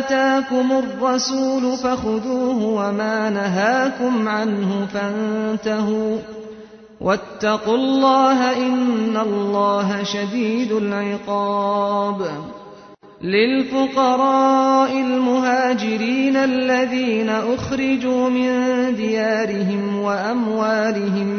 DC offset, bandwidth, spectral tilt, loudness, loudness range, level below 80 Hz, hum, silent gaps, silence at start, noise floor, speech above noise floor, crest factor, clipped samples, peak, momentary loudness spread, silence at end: under 0.1%; 6.6 kHz; -5.5 dB/octave; -19 LUFS; 4 LU; -56 dBFS; none; none; 0 s; -43 dBFS; 24 dB; 14 dB; under 0.1%; -4 dBFS; 6 LU; 0 s